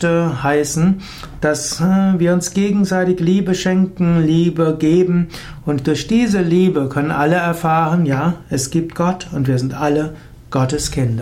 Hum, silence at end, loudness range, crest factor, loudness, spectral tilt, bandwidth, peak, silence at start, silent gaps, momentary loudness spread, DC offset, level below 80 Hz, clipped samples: none; 0 s; 3 LU; 12 dB; -16 LUFS; -6 dB/octave; 15.5 kHz; -4 dBFS; 0 s; none; 6 LU; under 0.1%; -40 dBFS; under 0.1%